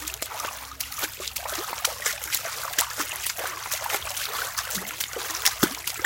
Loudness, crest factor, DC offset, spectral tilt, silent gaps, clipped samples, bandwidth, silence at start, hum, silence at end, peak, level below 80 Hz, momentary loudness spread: -27 LUFS; 28 dB; under 0.1%; -0.5 dB/octave; none; under 0.1%; 17.5 kHz; 0 s; none; 0 s; -2 dBFS; -54 dBFS; 7 LU